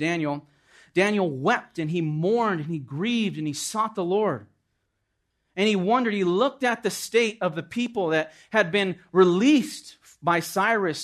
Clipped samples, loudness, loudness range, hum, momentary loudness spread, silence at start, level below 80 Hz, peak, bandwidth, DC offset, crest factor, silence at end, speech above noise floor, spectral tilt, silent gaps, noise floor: under 0.1%; -24 LUFS; 4 LU; none; 9 LU; 0 s; -72 dBFS; -4 dBFS; 13.5 kHz; under 0.1%; 20 dB; 0 s; 52 dB; -5 dB/octave; none; -76 dBFS